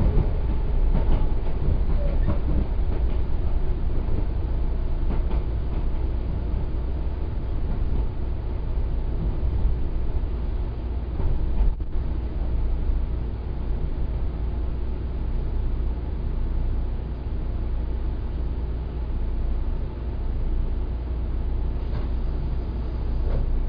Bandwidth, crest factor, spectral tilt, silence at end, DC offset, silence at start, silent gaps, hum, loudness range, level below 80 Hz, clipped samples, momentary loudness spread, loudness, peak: 5 kHz; 16 dB; -10.5 dB/octave; 0 s; under 0.1%; 0 s; none; none; 3 LU; -24 dBFS; under 0.1%; 5 LU; -29 LUFS; -8 dBFS